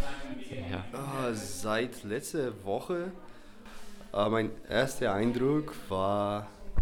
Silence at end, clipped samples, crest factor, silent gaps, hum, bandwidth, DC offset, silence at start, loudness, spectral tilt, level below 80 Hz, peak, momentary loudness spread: 0 s; under 0.1%; 18 dB; none; none; 18 kHz; under 0.1%; 0 s; -33 LUFS; -5.5 dB/octave; -52 dBFS; -14 dBFS; 13 LU